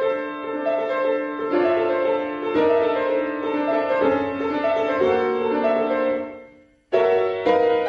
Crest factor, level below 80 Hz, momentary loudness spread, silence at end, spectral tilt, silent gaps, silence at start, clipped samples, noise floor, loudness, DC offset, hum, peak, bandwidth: 16 dB; -58 dBFS; 5 LU; 0 s; -6.5 dB/octave; none; 0 s; under 0.1%; -49 dBFS; -21 LUFS; under 0.1%; none; -6 dBFS; 6.6 kHz